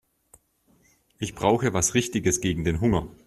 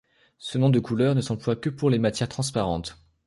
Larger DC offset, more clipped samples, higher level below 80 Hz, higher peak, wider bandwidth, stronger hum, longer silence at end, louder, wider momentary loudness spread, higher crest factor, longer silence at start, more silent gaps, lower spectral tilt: neither; neither; about the same, -46 dBFS vs -50 dBFS; first, -6 dBFS vs -10 dBFS; first, 13.5 kHz vs 11.5 kHz; neither; second, 0.15 s vs 0.35 s; about the same, -24 LUFS vs -25 LUFS; second, 5 LU vs 10 LU; first, 22 dB vs 16 dB; first, 1.2 s vs 0.4 s; neither; second, -4.5 dB/octave vs -6.5 dB/octave